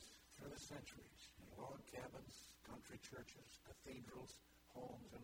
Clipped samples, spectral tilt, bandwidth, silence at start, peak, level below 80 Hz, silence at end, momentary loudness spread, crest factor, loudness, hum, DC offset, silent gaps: under 0.1%; -4 dB/octave; 19.5 kHz; 0 s; -40 dBFS; -74 dBFS; 0 s; 7 LU; 20 dB; -58 LUFS; none; under 0.1%; none